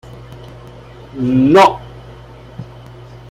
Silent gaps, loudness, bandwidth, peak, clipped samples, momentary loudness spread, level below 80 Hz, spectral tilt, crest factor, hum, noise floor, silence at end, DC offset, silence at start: none; -11 LUFS; 14.5 kHz; 0 dBFS; under 0.1%; 27 LU; -42 dBFS; -6.5 dB/octave; 16 dB; none; -36 dBFS; 0.15 s; under 0.1%; 0.15 s